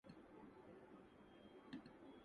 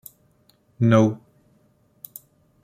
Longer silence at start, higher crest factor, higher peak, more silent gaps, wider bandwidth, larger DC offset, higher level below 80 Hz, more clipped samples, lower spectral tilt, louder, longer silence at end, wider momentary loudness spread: second, 0.05 s vs 0.8 s; about the same, 20 dB vs 22 dB; second, -42 dBFS vs -4 dBFS; neither; second, 10 kHz vs 16 kHz; neither; second, -82 dBFS vs -62 dBFS; neither; second, -6.5 dB/octave vs -8 dB/octave; second, -62 LUFS vs -19 LUFS; second, 0 s vs 1.5 s; second, 6 LU vs 26 LU